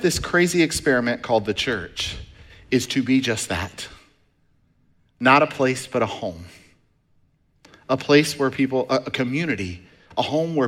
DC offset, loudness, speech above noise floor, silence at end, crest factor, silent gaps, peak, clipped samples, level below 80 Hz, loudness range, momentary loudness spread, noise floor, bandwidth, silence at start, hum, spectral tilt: under 0.1%; -21 LUFS; 41 dB; 0 s; 20 dB; none; -2 dBFS; under 0.1%; -48 dBFS; 3 LU; 14 LU; -62 dBFS; 16.5 kHz; 0 s; none; -4.5 dB/octave